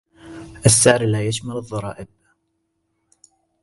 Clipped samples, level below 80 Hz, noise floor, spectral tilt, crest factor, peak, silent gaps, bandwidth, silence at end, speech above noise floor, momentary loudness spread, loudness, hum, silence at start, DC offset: under 0.1%; -48 dBFS; -72 dBFS; -4 dB/octave; 20 dB; -2 dBFS; none; 12 kHz; 1.6 s; 54 dB; 25 LU; -17 LUFS; none; 0.25 s; under 0.1%